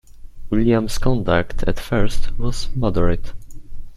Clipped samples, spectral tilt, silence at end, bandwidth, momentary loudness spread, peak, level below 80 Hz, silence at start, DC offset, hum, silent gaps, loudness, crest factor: under 0.1%; -6.5 dB/octave; 0 s; 12.5 kHz; 9 LU; -2 dBFS; -24 dBFS; 0.1 s; under 0.1%; none; none; -21 LUFS; 16 dB